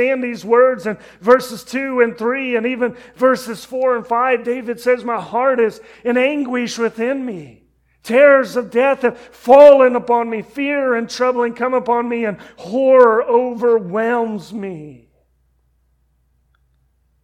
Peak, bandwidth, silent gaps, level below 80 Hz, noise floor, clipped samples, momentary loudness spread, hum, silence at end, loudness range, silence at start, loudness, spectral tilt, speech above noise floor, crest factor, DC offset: 0 dBFS; 14 kHz; none; -60 dBFS; -61 dBFS; 0.2%; 14 LU; none; 2.3 s; 7 LU; 0 s; -16 LUFS; -5 dB/octave; 45 dB; 16 dB; under 0.1%